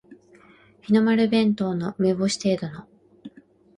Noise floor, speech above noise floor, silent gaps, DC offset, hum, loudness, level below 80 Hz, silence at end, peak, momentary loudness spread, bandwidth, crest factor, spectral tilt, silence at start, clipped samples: -53 dBFS; 32 dB; none; under 0.1%; none; -22 LUFS; -62 dBFS; 0.5 s; -8 dBFS; 15 LU; 11 kHz; 18 dB; -6 dB/octave; 0.1 s; under 0.1%